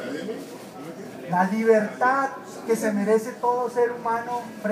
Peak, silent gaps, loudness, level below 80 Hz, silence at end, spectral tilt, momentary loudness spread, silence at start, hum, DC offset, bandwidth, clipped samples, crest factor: -6 dBFS; none; -24 LUFS; -74 dBFS; 0 s; -6 dB/octave; 17 LU; 0 s; none; under 0.1%; 15.5 kHz; under 0.1%; 18 dB